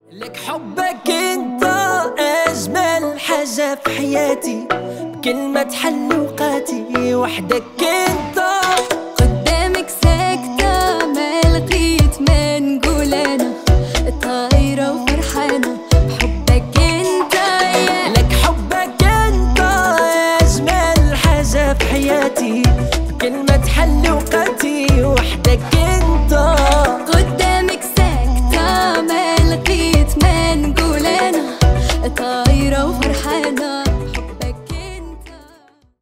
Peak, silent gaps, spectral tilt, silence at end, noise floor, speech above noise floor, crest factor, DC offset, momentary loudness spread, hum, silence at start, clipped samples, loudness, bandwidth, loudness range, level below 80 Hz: 0 dBFS; none; -5 dB/octave; 0.65 s; -49 dBFS; 31 dB; 14 dB; under 0.1%; 6 LU; none; 0.1 s; under 0.1%; -15 LUFS; 16.5 kHz; 4 LU; -20 dBFS